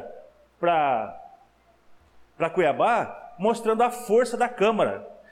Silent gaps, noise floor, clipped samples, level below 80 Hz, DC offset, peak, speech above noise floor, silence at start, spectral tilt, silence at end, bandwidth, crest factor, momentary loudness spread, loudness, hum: none; -59 dBFS; under 0.1%; -64 dBFS; under 0.1%; -12 dBFS; 36 dB; 0 s; -5 dB/octave; 0.2 s; 15.5 kHz; 14 dB; 10 LU; -24 LUFS; none